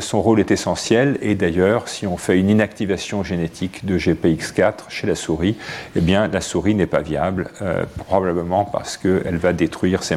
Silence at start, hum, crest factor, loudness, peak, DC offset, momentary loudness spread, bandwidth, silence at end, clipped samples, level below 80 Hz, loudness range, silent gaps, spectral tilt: 0 s; none; 16 dB; -20 LUFS; -2 dBFS; under 0.1%; 7 LU; 14 kHz; 0 s; under 0.1%; -42 dBFS; 2 LU; none; -5.5 dB/octave